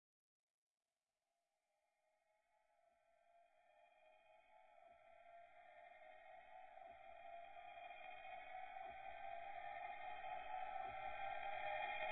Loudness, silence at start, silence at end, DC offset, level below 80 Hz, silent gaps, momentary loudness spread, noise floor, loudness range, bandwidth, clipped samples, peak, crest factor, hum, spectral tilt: -53 LUFS; 3.1 s; 0 s; under 0.1%; -80 dBFS; none; 17 LU; under -90 dBFS; 16 LU; 4.2 kHz; under 0.1%; -34 dBFS; 20 dB; none; 0.5 dB/octave